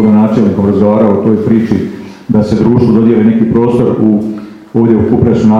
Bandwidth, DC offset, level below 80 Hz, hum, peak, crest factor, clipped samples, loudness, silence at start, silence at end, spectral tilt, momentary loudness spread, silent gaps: 7.2 kHz; under 0.1%; -38 dBFS; none; 0 dBFS; 8 dB; 0.5%; -9 LUFS; 0 s; 0 s; -9.5 dB/octave; 7 LU; none